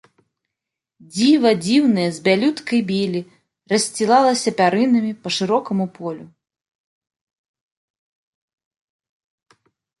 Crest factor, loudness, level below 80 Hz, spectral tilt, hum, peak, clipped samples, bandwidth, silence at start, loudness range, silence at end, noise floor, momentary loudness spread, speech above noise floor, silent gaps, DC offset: 18 dB; -18 LUFS; -66 dBFS; -4.5 dB/octave; none; -2 dBFS; under 0.1%; 11.5 kHz; 1.15 s; 10 LU; 3.75 s; -84 dBFS; 11 LU; 66 dB; none; under 0.1%